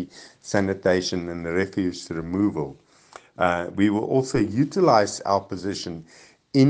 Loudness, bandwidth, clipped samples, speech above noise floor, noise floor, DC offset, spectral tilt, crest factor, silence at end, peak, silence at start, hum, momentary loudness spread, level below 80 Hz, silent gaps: -24 LUFS; 9.6 kHz; under 0.1%; 26 dB; -49 dBFS; under 0.1%; -6 dB/octave; 20 dB; 0 s; -4 dBFS; 0 s; none; 13 LU; -58 dBFS; none